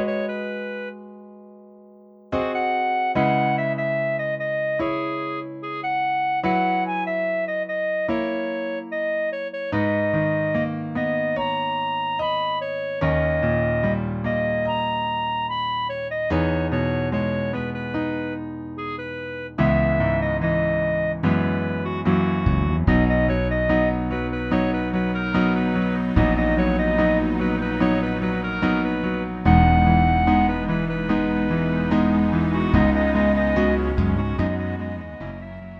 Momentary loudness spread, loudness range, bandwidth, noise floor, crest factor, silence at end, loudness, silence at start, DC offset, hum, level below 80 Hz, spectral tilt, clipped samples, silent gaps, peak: 9 LU; 5 LU; 6.4 kHz; -48 dBFS; 20 dB; 0 s; -22 LUFS; 0 s; under 0.1%; none; -34 dBFS; -9 dB/octave; under 0.1%; none; -2 dBFS